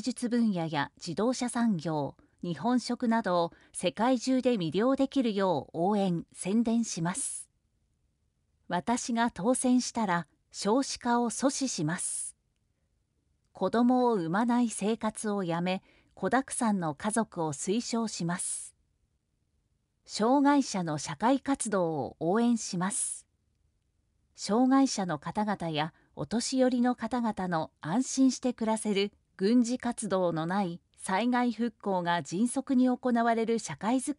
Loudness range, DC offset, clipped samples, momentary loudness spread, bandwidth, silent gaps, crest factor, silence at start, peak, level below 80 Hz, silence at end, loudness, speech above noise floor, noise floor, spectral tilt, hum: 3 LU; under 0.1%; under 0.1%; 8 LU; 11.5 kHz; none; 16 dB; 0 s; -14 dBFS; -68 dBFS; 0.05 s; -29 LUFS; 47 dB; -76 dBFS; -4.5 dB/octave; none